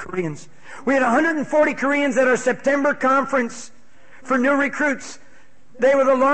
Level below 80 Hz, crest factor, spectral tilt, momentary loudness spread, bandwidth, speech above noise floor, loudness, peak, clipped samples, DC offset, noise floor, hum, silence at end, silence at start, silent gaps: -62 dBFS; 14 dB; -4.5 dB/octave; 12 LU; 8.8 kHz; 35 dB; -19 LUFS; -6 dBFS; under 0.1%; 1%; -54 dBFS; none; 0 s; 0 s; none